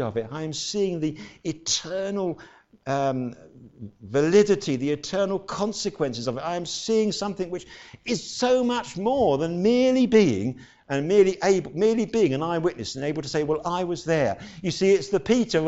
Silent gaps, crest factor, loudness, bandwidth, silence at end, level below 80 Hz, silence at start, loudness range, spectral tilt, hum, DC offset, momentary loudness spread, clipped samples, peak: none; 18 dB; -24 LUFS; 8.2 kHz; 0 s; -56 dBFS; 0 s; 6 LU; -5 dB/octave; none; under 0.1%; 12 LU; under 0.1%; -6 dBFS